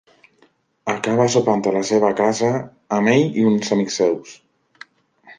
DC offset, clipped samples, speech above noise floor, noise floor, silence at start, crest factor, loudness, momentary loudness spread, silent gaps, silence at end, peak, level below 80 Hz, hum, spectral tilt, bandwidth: under 0.1%; under 0.1%; 41 dB; -59 dBFS; 0.85 s; 18 dB; -19 LUFS; 9 LU; none; 0.05 s; -2 dBFS; -62 dBFS; none; -5 dB/octave; 9.8 kHz